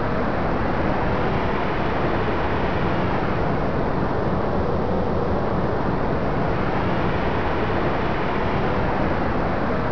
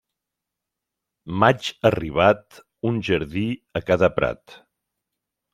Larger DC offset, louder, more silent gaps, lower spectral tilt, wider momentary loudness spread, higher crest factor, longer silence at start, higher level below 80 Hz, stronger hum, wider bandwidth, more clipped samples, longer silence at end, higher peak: first, 4% vs under 0.1%; about the same, -23 LUFS vs -22 LUFS; neither; first, -8.5 dB/octave vs -6.5 dB/octave; second, 1 LU vs 10 LU; second, 12 dB vs 22 dB; second, 0 s vs 1.25 s; first, -32 dBFS vs -50 dBFS; neither; second, 5.4 kHz vs 15 kHz; neither; second, 0 s vs 1 s; second, -8 dBFS vs -2 dBFS